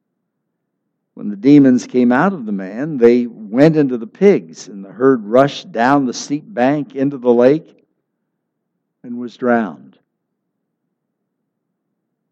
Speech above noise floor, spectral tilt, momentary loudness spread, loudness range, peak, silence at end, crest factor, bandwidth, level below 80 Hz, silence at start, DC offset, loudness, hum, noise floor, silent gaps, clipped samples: 59 dB; -7 dB/octave; 15 LU; 11 LU; 0 dBFS; 2.55 s; 16 dB; 8 kHz; -64 dBFS; 1.15 s; under 0.1%; -14 LUFS; none; -73 dBFS; none; under 0.1%